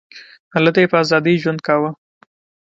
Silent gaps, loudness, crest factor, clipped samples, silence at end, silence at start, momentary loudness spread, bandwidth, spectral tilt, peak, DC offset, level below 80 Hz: 0.40-0.51 s; -16 LUFS; 18 dB; under 0.1%; 0.8 s; 0.15 s; 7 LU; 7.8 kHz; -6.5 dB/octave; 0 dBFS; under 0.1%; -62 dBFS